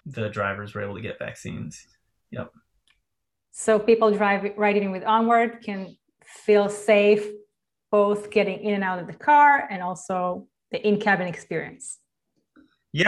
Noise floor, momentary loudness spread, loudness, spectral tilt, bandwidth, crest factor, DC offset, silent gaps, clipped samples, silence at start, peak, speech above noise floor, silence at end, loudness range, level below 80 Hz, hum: -84 dBFS; 19 LU; -22 LUFS; -5 dB/octave; 12 kHz; 18 dB; under 0.1%; none; under 0.1%; 0.05 s; -6 dBFS; 61 dB; 0 s; 6 LU; -64 dBFS; none